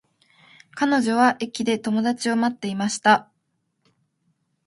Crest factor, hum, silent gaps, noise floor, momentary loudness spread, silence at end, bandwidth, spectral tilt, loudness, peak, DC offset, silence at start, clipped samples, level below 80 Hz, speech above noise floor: 22 dB; none; none; -73 dBFS; 7 LU; 1.45 s; 11.5 kHz; -4 dB/octave; -22 LUFS; -2 dBFS; under 0.1%; 0.75 s; under 0.1%; -68 dBFS; 52 dB